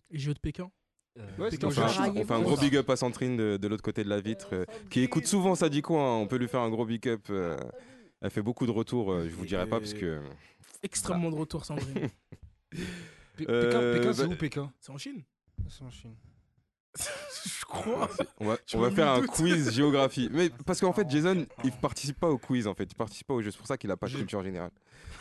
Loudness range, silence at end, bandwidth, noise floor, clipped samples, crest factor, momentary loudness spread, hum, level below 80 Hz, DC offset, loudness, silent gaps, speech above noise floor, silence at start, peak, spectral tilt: 8 LU; 0 s; 12.5 kHz; -68 dBFS; under 0.1%; 20 dB; 16 LU; none; -54 dBFS; under 0.1%; -30 LUFS; 16.80-16.93 s; 38 dB; 0.1 s; -12 dBFS; -5.5 dB/octave